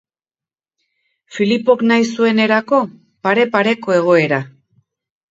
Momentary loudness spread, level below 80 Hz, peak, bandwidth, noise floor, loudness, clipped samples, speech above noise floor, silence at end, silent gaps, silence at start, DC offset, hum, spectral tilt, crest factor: 9 LU; -66 dBFS; 0 dBFS; 7.8 kHz; under -90 dBFS; -15 LUFS; under 0.1%; over 76 dB; 0.8 s; none; 1.3 s; under 0.1%; none; -5.5 dB/octave; 16 dB